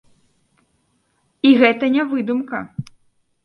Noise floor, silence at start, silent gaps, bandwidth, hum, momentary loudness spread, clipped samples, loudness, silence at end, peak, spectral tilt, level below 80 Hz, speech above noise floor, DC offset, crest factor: -65 dBFS; 1.45 s; none; 5.8 kHz; none; 17 LU; under 0.1%; -17 LUFS; 0.65 s; 0 dBFS; -7 dB/octave; -62 dBFS; 49 dB; under 0.1%; 20 dB